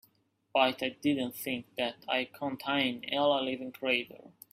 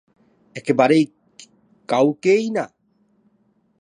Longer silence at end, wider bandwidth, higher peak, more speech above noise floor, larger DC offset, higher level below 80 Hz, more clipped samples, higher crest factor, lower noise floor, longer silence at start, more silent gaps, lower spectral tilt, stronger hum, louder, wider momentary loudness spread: second, 0.25 s vs 1.15 s; first, 16 kHz vs 10.5 kHz; second, -12 dBFS vs -2 dBFS; second, 39 dB vs 45 dB; neither; about the same, -74 dBFS vs -74 dBFS; neither; about the same, 22 dB vs 20 dB; first, -71 dBFS vs -63 dBFS; about the same, 0.55 s vs 0.55 s; neither; second, -4 dB/octave vs -6 dB/octave; neither; second, -31 LUFS vs -19 LUFS; second, 8 LU vs 15 LU